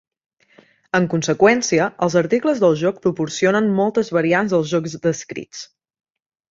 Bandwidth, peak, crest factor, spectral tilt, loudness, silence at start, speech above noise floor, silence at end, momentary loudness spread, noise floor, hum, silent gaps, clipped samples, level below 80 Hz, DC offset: 8 kHz; -2 dBFS; 18 dB; -5 dB/octave; -18 LUFS; 0.95 s; 36 dB; 0.85 s; 8 LU; -54 dBFS; none; none; under 0.1%; -60 dBFS; under 0.1%